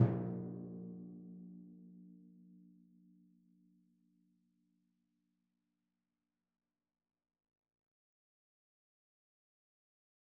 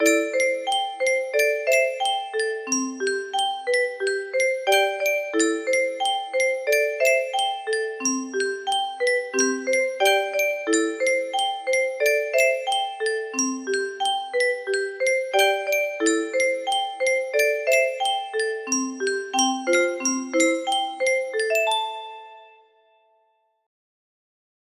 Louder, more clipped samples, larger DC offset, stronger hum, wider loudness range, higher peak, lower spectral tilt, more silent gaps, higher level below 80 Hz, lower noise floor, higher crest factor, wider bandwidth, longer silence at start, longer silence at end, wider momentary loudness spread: second, -44 LUFS vs -22 LUFS; neither; neither; neither; first, 19 LU vs 2 LU; second, -16 dBFS vs -6 dBFS; first, -10.5 dB/octave vs 0.5 dB/octave; neither; about the same, -74 dBFS vs -74 dBFS; first, under -90 dBFS vs -67 dBFS; first, 30 dB vs 18 dB; second, 2.2 kHz vs 15.5 kHz; about the same, 0 s vs 0 s; first, 7.55 s vs 2.2 s; first, 22 LU vs 6 LU